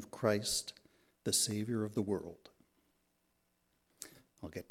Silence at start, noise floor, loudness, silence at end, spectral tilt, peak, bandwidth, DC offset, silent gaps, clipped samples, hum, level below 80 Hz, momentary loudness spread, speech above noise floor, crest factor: 0 s; -79 dBFS; -35 LUFS; 0.1 s; -3.5 dB/octave; -16 dBFS; 17 kHz; under 0.1%; none; under 0.1%; none; -70 dBFS; 20 LU; 42 dB; 24 dB